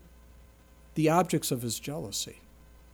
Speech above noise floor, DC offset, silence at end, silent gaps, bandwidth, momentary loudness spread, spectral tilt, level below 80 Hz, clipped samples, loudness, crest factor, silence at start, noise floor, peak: 27 dB; under 0.1%; 0.55 s; none; over 20 kHz; 11 LU; -4.5 dB/octave; -56 dBFS; under 0.1%; -30 LUFS; 20 dB; 0.05 s; -55 dBFS; -12 dBFS